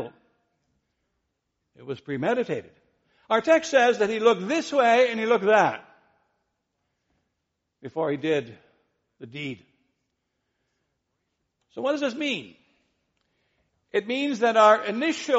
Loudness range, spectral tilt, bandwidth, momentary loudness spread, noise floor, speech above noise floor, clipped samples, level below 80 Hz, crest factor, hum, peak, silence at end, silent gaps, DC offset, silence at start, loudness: 12 LU; -2.5 dB/octave; 8 kHz; 18 LU; -80 dBFS; 57 dB; under 0.1%; -74 dBFS; 22 dB; none; -6 dBFS; 0 s; none; under 0.1%; 0 s; -23 LUFS